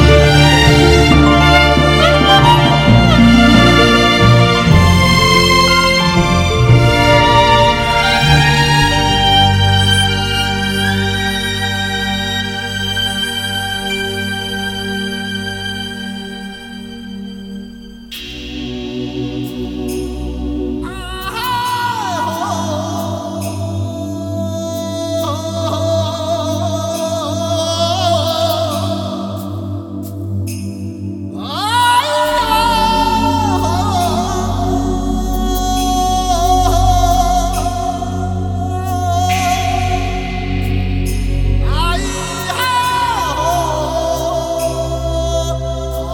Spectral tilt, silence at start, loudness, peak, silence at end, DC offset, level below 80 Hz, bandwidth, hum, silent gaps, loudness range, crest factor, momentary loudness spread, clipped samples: -5 dB/octave; 0 s; -13 LUFS; 0 dBFS; 0 s; under 0.1%; -24 dBFS; 19 kHz; none; none; 13 LU; 14 dB; 14 LU; under 0.1%